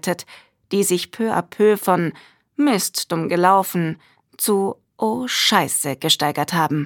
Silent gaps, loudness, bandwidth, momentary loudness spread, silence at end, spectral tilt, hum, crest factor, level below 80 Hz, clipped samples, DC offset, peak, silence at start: none; -19 LUFS; 19 kHz; 10 LU; 0 s; -3.5 dB/octave; none; 18 dB; -66 dBFS; under 0.1%; under 0.1%; -2 dBFS; 0.05 s